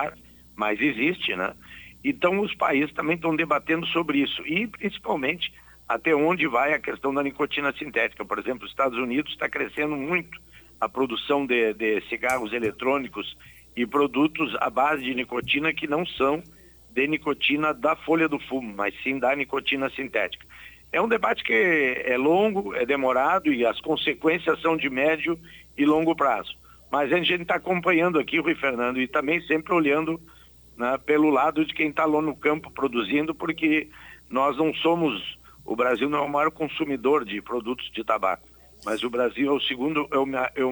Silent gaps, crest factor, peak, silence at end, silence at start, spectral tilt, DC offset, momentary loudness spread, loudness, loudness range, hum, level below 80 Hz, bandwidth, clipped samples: none; 18 dB; -8 dBFS; 0 s; 0 s; -5.5 dB/octave; under 0.1%; 9 LU; -24 LUFS; 3 LU; none; -58 dBFS; over 20 kHz; under 0.1%